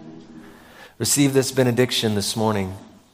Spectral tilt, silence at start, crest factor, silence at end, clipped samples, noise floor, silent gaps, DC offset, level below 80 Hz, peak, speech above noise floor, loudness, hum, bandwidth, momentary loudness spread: -4 dB/octave; 0 s; 18 dB; 0.25 s; under 0.1%; -45 dBFS; none; under 0.1%; -58 dBFS; -4 dBFS; 25 dB; -20 LUFS; none; 16 kHz; 14 LU